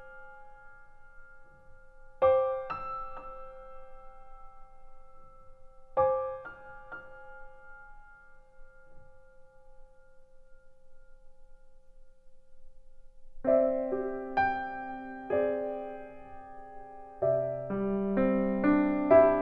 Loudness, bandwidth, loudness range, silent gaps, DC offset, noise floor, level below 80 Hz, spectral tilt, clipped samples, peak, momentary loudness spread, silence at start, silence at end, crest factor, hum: -29 LUFS; 5.2 kHz; 13 LU; none; under 0.1%; -53 dBFS; -54 dBFS; -9.5 dB/octave; under 0.1%; -10 dBFS; 25 LU; 0 s; 0 s; 24 dB; 60 Hz at -80 dBFS